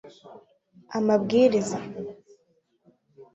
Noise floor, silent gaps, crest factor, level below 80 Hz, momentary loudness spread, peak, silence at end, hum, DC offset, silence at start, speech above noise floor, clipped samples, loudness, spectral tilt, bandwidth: -69 dBFS; none; 20 dB; -68 dBFS; 18 LU; -8 dBFS; 0.1 s; none; under 0.1%; 0.05 s; 44 dB; under 0.1%; -24 LUFS; -6 dB/octave; 8.2 kHz